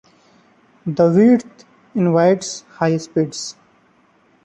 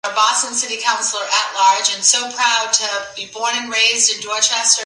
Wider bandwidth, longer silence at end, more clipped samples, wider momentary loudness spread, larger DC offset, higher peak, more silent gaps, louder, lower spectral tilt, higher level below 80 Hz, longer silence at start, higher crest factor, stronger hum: second, 9 kHz vs 11.5 kHz; first, 0.95 s vs 0 s; neither; first, 16 LU vs 7 LU; neither; about the same, -2 dBFS vs 0 dBFS; neither; about the same, -17 LUFS vs -15 LUFS; first, -6.5 dB/octave vs 2.5 dB/octave; first, -60 dBFS vs -70 dBFS; first, 0.85 s vs 0.05 s; about the same, 16 dB vs 18 dB; neither